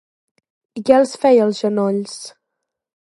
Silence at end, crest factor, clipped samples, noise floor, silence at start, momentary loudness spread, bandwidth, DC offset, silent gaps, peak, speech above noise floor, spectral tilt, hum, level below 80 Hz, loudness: 0.9 s; 18 dB; under 0.1%; -79 dBFS; 0.75 s; 19 LU; 11.5 kHz; under 0.1%; none; 0 dBFS; 63 dB; -5.5 dB/octave; none; -64 dBFS; -16 LUFS